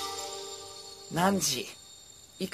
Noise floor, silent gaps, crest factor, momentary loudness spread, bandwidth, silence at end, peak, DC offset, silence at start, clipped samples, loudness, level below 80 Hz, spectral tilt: -52 dBFS; none; 22 dB; 22 LU; 14 kHz; 0 s; -12 dBFS; under 0.1%; 0 s; under 0.1%; -31 LUFS; -64 dBFS; -3 dB/octave